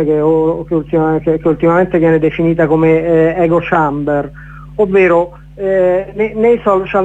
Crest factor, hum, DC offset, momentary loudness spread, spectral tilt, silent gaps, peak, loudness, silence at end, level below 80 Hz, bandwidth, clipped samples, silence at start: 12 dB; none; under 0.1%; 7 LU; -9.5 dB/octave; none; 0 dBFS; -12 LUFS; 0 s; -38 dBFS; 7.8 kHz; under 0.1%; 0 s